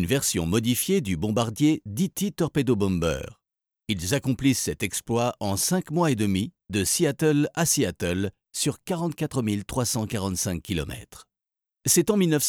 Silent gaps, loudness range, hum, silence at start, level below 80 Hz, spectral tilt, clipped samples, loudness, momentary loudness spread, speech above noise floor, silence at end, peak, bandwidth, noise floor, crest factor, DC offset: none; 4 LU; none; 0 s; -48 dBFS; -4.5 dB/octave; under 0.1%; -25 LUFS; 7 LU; 65 dB; 0 s; -8 dBFS; over 20 kHz; -89 dBFS; 16 dB; under 0.1%